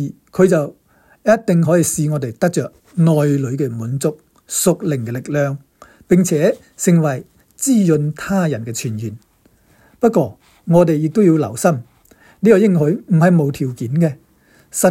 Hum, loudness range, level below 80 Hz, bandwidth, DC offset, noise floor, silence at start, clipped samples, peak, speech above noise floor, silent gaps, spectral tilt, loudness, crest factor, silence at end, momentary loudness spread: none; 4 LU; -54 dBFS; 16 kHz; under 0.1%; -54 dBFS; 0 s; under 0.1%; 0 dBFS; 39 dB; none; -6.5 dB/octave; -16 LUFS; 16 dB; 0 s; 10 LU